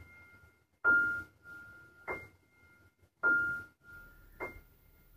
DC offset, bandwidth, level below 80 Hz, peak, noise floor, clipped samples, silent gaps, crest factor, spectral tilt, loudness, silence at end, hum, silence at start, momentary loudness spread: under 0.1%; 15.5 kHz; -64 dBFS; -18 dBFS; -66 dBFS; under 0.1%; none; 20 dB; -5.5 dB/octave; -33 LUFS; 0.6 s; none; 0 s; 26 LU